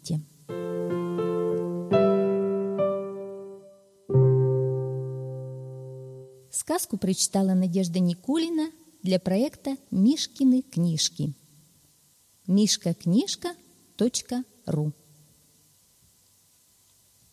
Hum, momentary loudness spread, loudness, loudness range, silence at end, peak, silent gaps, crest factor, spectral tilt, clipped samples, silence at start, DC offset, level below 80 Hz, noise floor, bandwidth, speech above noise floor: none; 16 LU; -26 LUFS; 4 LU; 2.4 s; -8 dBFS; none; 18 dB; -5.5 dB/octave; under 0.1%; 0.05 s; under 0.1%; -64 dBFS; -62 dBFS; 15 kHz; 37 dB